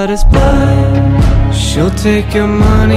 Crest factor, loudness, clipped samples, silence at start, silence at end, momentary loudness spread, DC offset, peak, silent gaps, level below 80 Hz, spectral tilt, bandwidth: 8 dB; -10 LUFS; under 0.1%; 0 s; 0 s; 3 LU; under 0.1%; -2 dBFS; none; -12 dBFS; -6.5 dB/octave; 14 kHz